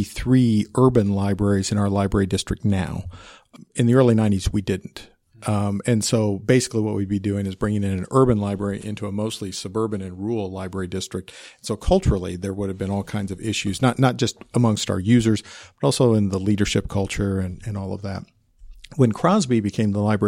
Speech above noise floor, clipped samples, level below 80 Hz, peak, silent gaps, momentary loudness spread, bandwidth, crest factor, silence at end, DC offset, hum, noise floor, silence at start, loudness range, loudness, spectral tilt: 23 dB; under 0.1%; -38 dBFS; -4 dBFS; none; 12 LU; 15.5 kHz; 18 dB; 0 s; under 0.1%; none; -44 dBFS; 0 s; 5 LU; -22 LUFS; -6 dB/octave